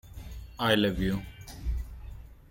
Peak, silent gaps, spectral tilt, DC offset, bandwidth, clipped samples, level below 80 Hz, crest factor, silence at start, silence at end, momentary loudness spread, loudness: -8 dBFS; none; -5.5 dB/octave; under 0.1%; 17 kHz; under 0.1%; -40 dBFS; 22 dB; 0.05 s; 0.05 s; 21 LU; -30 LUFS